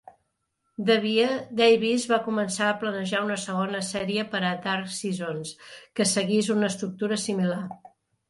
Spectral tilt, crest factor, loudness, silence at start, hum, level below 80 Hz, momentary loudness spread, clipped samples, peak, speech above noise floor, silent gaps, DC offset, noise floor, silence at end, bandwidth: -4 dB/octave; 18 dB; -25 LUFS; 0.8 s; none; -68 dBFS; 12 LU; under 0.1%; -8 dBFS; 51 dB; none; under 0.1%; -76 dBFS; 0.55 s; 11.5 kHz